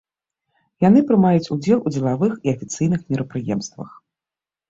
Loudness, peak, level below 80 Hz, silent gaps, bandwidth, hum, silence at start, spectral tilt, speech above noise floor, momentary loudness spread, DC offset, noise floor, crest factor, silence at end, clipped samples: -19 LUFS; -4 dBFS; -56 dBFS; none; 7.8 kHz; none; 0.8 s; -7.5 dB/octave; 71 dB; 12 LU; under 0.1%; -90 dBFS; 16 dB; 0.8 s; under 0.1%